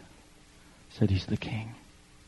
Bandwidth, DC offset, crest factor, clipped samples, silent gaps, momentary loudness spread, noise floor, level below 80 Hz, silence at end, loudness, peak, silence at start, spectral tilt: 11.5 kHz; under 0.1%; 22 dB; under 0.1%; none; 22 LU; -56 dBFS; -54 dBFS; 0.45 s; -31 LUFS; -12 dBFS; 0 s; -7 dB/octave